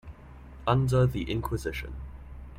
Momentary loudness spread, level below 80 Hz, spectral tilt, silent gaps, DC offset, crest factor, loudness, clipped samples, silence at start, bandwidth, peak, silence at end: 23 LU; -42 dBFS; -7 dB/octave; none; under 0.1%; 20 dB; -28 LUFS; under 0.1%; 0.05 s; 15.5 kHz; -10 dBFS; 0 s